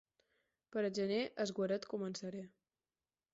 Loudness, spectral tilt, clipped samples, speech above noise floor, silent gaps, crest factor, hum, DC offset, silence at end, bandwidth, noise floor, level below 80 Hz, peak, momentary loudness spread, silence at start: -40 LUFS; -4.5 dB/octave; under 0.1%; over 51 dB; none; 16 dB; none; under 0.1%; 0.85 s; 7.6 kHz; under -90 dBFS; -82 dBFS; -26 dBFS; 10 LU; 0.7 s